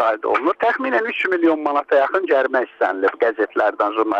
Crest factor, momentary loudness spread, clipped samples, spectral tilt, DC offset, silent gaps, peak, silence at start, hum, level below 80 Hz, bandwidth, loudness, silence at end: 12 dB; 3 LU; under 0.1%; -5 dB/octave; under 0.1%; none; -6 dBFS; 0 s; none; -70 dBFS; 7.6 kHz; -19 LUFS; 0 s